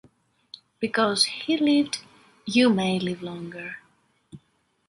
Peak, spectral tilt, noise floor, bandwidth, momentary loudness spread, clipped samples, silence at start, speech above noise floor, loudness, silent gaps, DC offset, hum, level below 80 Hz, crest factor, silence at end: -6 dBFS; -4 dB/octave; -68 dBFS; 11.5 kHz; 16 LU; under 0.1%; 0.8 s; 45 dB; -24 LUFS; none; under 0.1%; none; -66 dBFS; 20 dB; 0.5 s